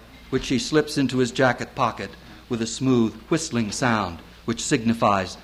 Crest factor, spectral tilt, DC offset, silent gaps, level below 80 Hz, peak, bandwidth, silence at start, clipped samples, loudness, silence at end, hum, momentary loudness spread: 18 dB; -4.5 dB/octave; under 0.1%; none; -48 dBFS; -6 dBFS; 14.5 kHz; 0 s; under 0.1%; -23 LUFS; 0 s; none; 10 LU